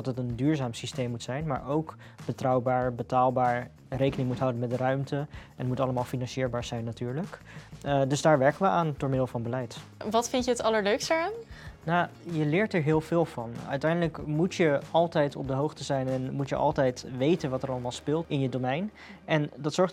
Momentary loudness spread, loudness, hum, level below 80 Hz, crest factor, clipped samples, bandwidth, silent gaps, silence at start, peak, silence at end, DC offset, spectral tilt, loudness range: 10 LU; -29 LUFS; none; -56 dBFS; 20 dB; under 0.1%; 14.5 kHz; none; 0 s; -8 dBFS; 0 s; under 0.1%; -6 dB/octave; 3 LU